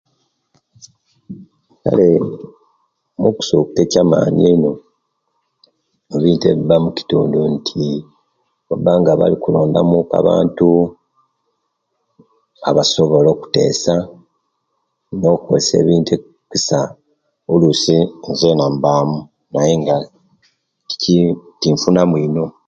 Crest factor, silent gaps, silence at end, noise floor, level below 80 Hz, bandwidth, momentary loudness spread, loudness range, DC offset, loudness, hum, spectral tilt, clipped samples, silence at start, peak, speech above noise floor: 16 dB; none; 0.2 s; -70 dBFS; -48 dBFS; 7.8 kHz; 12 LU; 3 LU; under 0.1%; -15 LUFS; none; -6 dB/octave; under 0.1%; 1.3 s; 0 dBFS; 56 dB